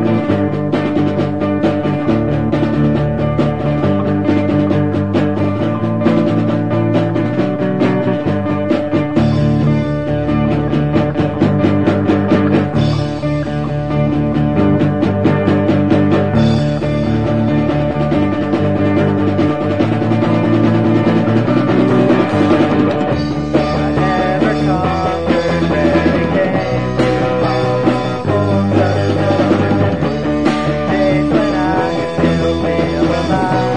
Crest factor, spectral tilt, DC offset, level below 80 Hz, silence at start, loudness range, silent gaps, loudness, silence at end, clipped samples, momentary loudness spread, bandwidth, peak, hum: 12 dB; -8 dB/octave; 2%; -34 dBFS; 0 s; 2 LU; none; -14 LUFS; 0 s; under 0.1%; 4 LU; 9.6 kHz; 0 dBFS; none